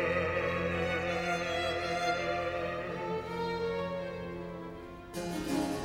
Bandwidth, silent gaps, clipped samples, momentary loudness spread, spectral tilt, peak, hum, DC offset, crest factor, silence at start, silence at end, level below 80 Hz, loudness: 17 kHz; none; under 0.1%; 10 LU; -5 dB/octave; -18 dBFS; none; under 0.1%; 16 dB; 0 s; 0 s; -56 dBFS; -34 LUFS